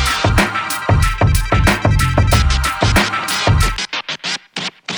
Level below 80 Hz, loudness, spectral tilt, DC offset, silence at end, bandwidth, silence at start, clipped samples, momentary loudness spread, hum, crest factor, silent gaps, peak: -20 dBFS; -15 LUFS; -4.5 dB/octave; under 0.1%; 0 s; 19.5 kHz; 0 s; under 0.1%; 8 LU; none; 14 dB; none; 0 dBFS